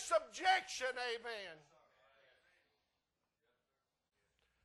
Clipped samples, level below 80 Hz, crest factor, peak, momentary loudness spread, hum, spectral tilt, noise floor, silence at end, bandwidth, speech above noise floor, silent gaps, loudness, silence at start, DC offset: under 0.1%; -82 dBFS; 22 dB; -20 dBFS; 13 LU; none; 0 dB/octave; -88 dBFS; 3.05 s; 12 kHz; 49 dB; none; -38 LUFS; 0 s; under 0.1%